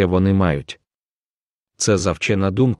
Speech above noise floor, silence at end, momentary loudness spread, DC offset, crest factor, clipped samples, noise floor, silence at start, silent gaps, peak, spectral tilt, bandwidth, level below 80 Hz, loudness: over 73 dB; 0.05 s; 14 LU; under 0.1%; 16 dB; under 0.1%; under -90 dBFS; 0 s; 0.95-1.67 s; -2 dBFS; -5.5 dB/octave; 11.5 kHz; -42 dBFS; -19 LUFS